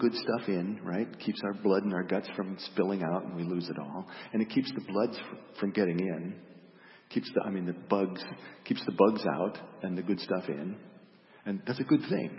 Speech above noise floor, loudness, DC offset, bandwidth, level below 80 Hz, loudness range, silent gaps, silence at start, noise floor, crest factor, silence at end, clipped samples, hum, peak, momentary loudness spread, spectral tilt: 25 dB; -32 LUFS; under 0.1%; 5.8 kHz; -78 dBFS; 2 LU; none; 0 s; -57 dBFS; 24 dB; 0 s; under 0.1%; none; -8 dBFS; 12 LU; -10 dB/octave